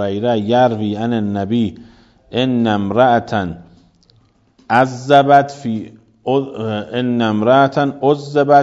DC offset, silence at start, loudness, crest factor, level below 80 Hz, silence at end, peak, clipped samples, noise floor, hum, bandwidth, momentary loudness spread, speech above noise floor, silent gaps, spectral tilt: under 0.1%; 0 s; -16 LUFS; 16 dB; -54 dBFS; 0 s; 0 dBFS; under 0.1%; -54 dBFS; none; 7.8 kHz; 11 LU; 39 dB; none; -7 dB/octave